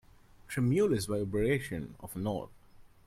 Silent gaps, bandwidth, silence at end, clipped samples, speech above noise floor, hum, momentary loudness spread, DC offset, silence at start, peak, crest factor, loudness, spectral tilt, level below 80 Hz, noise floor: none; 16 kHz; 0.2 s; under 0.1%; 23 dB; none; 12 LU; under 0.1%; 0.5 s; -18 dBFS; 16 dB; -32 LUFS; -6.5 dB/octave; -54 dBFS; -54 dBFS